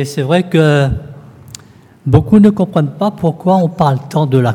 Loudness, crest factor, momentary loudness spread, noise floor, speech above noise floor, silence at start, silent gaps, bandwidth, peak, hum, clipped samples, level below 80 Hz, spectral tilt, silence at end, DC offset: -12 LUFS; 12 dB; 8 LU; -37 dBFS; 26 dB; 0 s; none; 13.5 kHz; 0 dBFS; none; 0.2%; -36 dBFS; -7.5 dB/octave; 0 s; under 0.1%